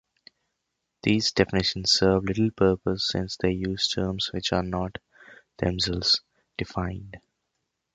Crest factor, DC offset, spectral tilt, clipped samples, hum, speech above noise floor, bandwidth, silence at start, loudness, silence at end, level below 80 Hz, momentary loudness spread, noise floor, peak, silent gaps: 22 dB; under 0.1%; -4.5 dB/octave; under 0.1%; none; 55 dB; 9.2 kHz; 1.05 s; -25 LUFS; 0.75 s; -46 dBFS; 12 LU; -81 dBFS; -4 dBFS; none